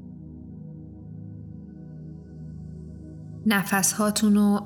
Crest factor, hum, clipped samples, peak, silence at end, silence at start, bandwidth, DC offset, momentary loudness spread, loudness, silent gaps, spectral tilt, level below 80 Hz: 20 dB; none; under 0.1%; -8 dBFS; 0 s; 0 s; 19 kHz; under 0.1%; 21 LU; -22 LUFS; none; -4 dB/octave; -52 dBFS